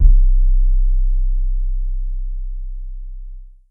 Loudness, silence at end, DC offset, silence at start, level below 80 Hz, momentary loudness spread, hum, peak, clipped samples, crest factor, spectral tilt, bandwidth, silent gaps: -22 LUFS; 0.25 s; under 0.1%; 0 s; -14 dBFS; 18 LU; none; 0 dBFS; under 0.1%; 14 dB; -13.5 dB/octave; 0.3 kHz; none